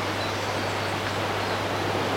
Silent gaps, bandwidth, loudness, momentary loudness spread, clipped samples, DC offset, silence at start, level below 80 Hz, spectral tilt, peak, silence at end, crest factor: none; 16.5 kHz; -27 LUFS; 1 LU; under 0.1%; under 0.1%; 0 s; -54 dBFS; -4 dB/octave; -12 dBFS; 0 s; 16 dB